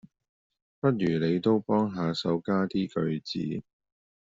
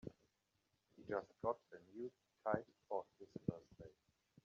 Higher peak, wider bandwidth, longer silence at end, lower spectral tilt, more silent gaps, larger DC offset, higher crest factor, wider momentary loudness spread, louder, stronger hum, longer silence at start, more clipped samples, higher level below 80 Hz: first, -10 dBFS vs -24 dBFS; about the same, 7.8 kHz vs 7.4 kHz; about the same, 0.6 s vs 0.55 s; second, -6 dB/octave vs -7.5 dB/octave; neither; neither; second, 18 dB vs 26 dB; second, 7 LU vs 17 LU; first, -28 LUFS vs -47 LUFS; neither; first, 0.85 s vs 0.05 s; neither; first, -64 dBFS vs -78 dBFS